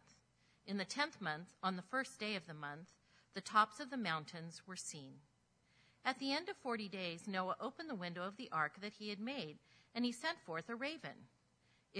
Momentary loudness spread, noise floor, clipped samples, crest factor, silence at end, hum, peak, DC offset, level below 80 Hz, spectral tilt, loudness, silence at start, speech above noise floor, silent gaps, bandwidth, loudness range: 12 LU; -76 dBFS; under 0.1%; 24 dB; 0 s; none; -20 dBFS; under 0.1%; -86 dBFS; -4 dB/octave; -43 LUFS; 0.1 s; 33 dB; none; 11 kHz; 3 LU